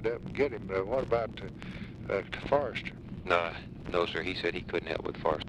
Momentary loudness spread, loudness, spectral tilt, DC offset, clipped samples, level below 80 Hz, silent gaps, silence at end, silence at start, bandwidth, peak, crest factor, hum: 12 LU; -33 LUFS; -6.5 dB/octave; under 0.1%; under 0.1%; -50 dBFS; none; 0 s; 0 s; 10.5 kHz; -12 dBFS; 20 dB; none